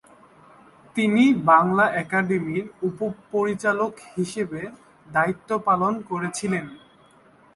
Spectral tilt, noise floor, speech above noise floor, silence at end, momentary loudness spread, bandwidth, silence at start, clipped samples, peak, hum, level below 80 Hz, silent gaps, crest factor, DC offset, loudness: -6 dB/octave; -54 dBFS; 32 dB; 0.8 s; 13 LU; 11.5 kHz; 0.95 s; under 0.1%; -4 dBFS; none; -62 dBFS; none; 18 dB; under 0.1%; -23 LUFS